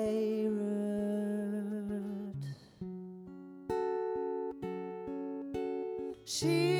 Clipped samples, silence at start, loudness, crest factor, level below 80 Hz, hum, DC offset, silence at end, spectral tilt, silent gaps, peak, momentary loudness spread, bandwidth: under 0.1%; 0 s; -37 LUFS; 16 dB; -68 dBFS; none; under 0.1%; 0 s; -5.5 dB/octave; none; -20 dBFS; 13 LU; 16.5 kHz